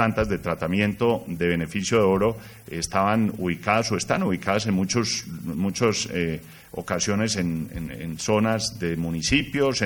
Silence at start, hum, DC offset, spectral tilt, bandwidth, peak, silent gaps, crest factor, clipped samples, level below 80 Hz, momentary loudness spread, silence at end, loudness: 0 s; none; under 0.1%; -4.5 dB/octave; over 20 kHz; -4 dBFS; none; 20 dB; under 0.1%; -46 dBFS; 9 LU; 0 s; -24 LUFS